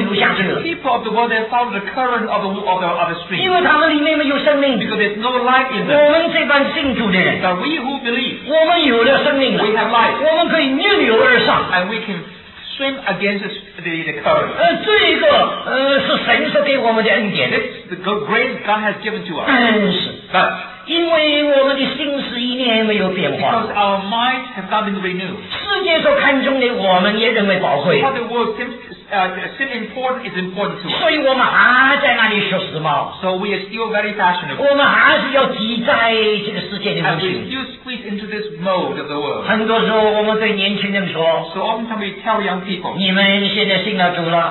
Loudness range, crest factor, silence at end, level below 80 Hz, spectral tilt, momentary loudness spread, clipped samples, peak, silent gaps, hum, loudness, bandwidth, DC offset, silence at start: 4 LU; 16 dB; 0 s; -52 dBFS; -7.5 dB/octave; 10 LU; under 0.1%; 0 dBFS; none; none; -15 LUFS; 4.3 kHz; under 0.1%; 0 s